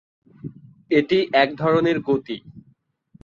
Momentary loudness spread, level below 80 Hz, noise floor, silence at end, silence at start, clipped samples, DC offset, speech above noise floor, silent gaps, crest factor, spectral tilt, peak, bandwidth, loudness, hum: 20 LU; -60 dBFS; -61 dBFS; 0.65 s; 0.45 s; under 0.1%; under 0.1%; 41 dB; none; 20 dB; -7.5 dB/octave; -2 dBFS; 7.2 kHz; -20 LUFS; none